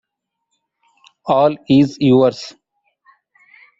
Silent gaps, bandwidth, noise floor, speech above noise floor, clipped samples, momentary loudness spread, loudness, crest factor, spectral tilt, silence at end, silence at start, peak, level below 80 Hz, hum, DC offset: none; 7.6 kHz; -77 dBFS; 63 dB; under 0.1%; 19 LU; -14 LUFS; 16 dB; -7.5 dB/octave; 1.3 s; 1.25 s; -2 dBFS; -56 dBFS; none; under 0.1%